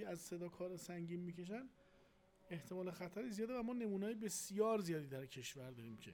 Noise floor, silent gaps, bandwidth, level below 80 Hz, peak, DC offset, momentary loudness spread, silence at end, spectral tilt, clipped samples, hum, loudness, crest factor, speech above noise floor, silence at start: -71 dBFS; none; over 20 kHz; -78 dBFS; -26 dBFS; under 0.1%; 13 LU; 0 s; -5 dB/octave; under 0.1%; none; -46 LUFS; 20 dB; 26 dB; 0 s